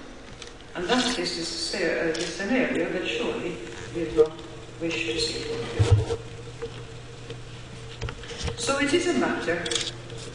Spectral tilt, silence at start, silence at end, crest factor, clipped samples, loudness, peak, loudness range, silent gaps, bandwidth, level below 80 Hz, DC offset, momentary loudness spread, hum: -4.5 dB/octave; 0 s; 0 s; 20 dB; under 0.1%; -26 LUFS; -8 dBFS; 3 LU; none; 10.5 kHz; -46 dBFS; 0.3%; 17 LU; none